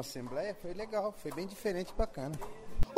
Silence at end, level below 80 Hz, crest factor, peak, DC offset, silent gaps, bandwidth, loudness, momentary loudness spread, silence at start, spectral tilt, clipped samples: 0 s; -42 dBFS; 22 dB; -14 dBFS; under 0.1%; none; 16 kHz; -39 LUFS; 6 LU; 0 s; -5.5 dB/octave; under 0.1%